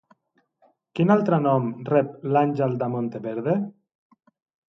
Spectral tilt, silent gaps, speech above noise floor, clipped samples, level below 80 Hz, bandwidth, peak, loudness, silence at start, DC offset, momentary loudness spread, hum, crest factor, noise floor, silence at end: -10 dB/octave; none; 46 dB; under 0.1%; -70 dBFS; 6.4 kHz; -6 dBFS; -23 LUFS; 0.95 s; under 0.1%; 9 LU; none; 18 dB; -68 dBFS; 1 s